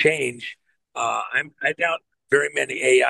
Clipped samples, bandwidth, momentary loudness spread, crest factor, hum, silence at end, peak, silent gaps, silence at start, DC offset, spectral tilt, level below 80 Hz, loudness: under 0.1%; 12.5 kHz; 13 LU; 20 dB; none; 0 s; -4 dBFS; none; 0 s; under 0.1%; -3 dB/octave; -72 dBFS; -23 LUFS